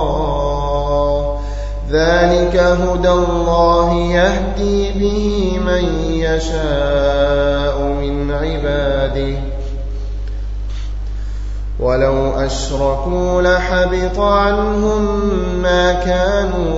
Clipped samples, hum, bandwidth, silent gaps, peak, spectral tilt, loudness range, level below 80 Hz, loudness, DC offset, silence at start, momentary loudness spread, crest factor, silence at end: under 0.1%; none; 8 kHz; none; 0 dBFS; -6 dB/octave; 7 LU; -22 dBFS; -16 LUFS; 0.7%; 0 s; 12 LU; 14 dB; 0 s